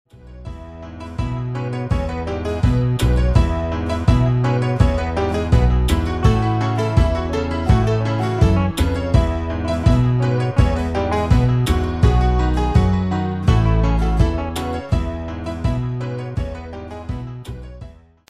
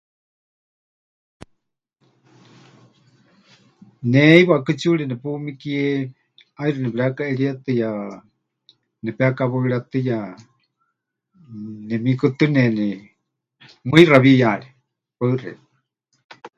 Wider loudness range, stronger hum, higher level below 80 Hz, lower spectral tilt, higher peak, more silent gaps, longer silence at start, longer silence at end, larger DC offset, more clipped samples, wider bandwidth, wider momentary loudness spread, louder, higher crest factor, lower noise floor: second, 5 LU vs 8 LU; neither; first, -22 dBFS vs -62 dBFS; about the same, -7.5 dB/octave vs -7.5 dB/octave; about the same, -2 dBFS vs 0 dBFS; second, none vs 16.24-16.29 s; second, 0.15 s vs 4 s; first, 0.3 s vs 0.1 s; first, 0.6% vs under 0.1%; neither; first, 14 kHz vs 9.4 kHz; second, 13 LU vs 20 LU; about the same, -19 LUFS vs -18 LUFS; about the same, 16 dB vs 20 dB; second, -39 dBFS vs -76 dBFS